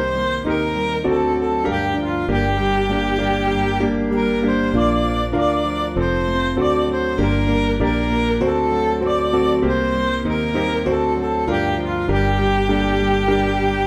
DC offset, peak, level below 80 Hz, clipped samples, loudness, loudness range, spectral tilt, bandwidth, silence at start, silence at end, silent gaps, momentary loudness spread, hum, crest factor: under 0.1%; -6 dBFS; -28 dBFS; under 0.1%; -19 LUFS; 1 LU; -7 dB/octave; 12.5 kHz; 0 s; 0 s; none; 3 LU; none; 14 dB